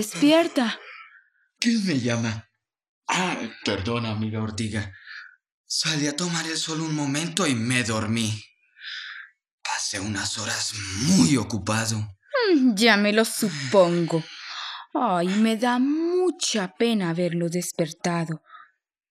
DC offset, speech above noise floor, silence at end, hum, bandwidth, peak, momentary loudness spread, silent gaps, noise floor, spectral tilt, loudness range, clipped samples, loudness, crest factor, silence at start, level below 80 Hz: under 0.1%; 34 dB; 0.5 s; none; 14.5 kHz; -2 dBFS; 16 LU; 2.89-3.02 s, 5.52-5.64 s, 9.51-9.58 s; -58 dBFS; -4 dB/octave; 6 LU; under 0.1%; -24 LUFS; 22 dB; 0 s; -68 dBFS